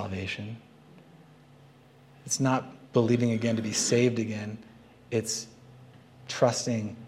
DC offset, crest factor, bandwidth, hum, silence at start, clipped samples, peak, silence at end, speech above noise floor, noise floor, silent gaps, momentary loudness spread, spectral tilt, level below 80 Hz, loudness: under 0.1%; 20 dB; 15 kHz; none; 0 s; under 0.1%; -10 dBFS; 0 s; 28 dB; -55 dBFS; none; 18 LU; -4.5 dB/octave; -70 dBFS; -28 LUFS